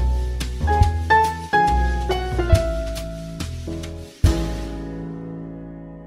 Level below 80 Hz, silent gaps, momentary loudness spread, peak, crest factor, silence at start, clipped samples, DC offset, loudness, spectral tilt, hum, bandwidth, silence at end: -26 dBFS; none; 15 LU; -2 dBFS; 20 dB; 0 s; under 0.1%; under 0.1%; -22 LUFS; -6 dB/octave; none; 15 kHz; 0 s